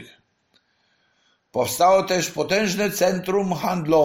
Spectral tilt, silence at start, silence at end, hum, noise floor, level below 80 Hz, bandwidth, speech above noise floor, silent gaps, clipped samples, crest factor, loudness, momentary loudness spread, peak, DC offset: -4 dB/octave; 0 s; 0 s; none; -66 dBFS; -56 dBFS; 16.5 kHz; 46 dB; none; under 0.1%; 16 dB; -21 LUFS; 7 LU; -6 dBFS; under 0.1%